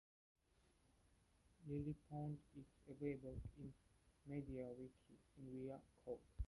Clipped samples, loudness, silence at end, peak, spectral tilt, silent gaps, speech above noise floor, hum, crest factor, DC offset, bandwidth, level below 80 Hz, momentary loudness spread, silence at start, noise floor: under 0.1%; -54 LUFS; 0 s; -34 dBFS; -9 dB/octave; none; 26 dB; none; 20 dB; under 0.1%; 11.5 kHz; -64 dBFS; 13 LU; 1.6 s; -79 dBFS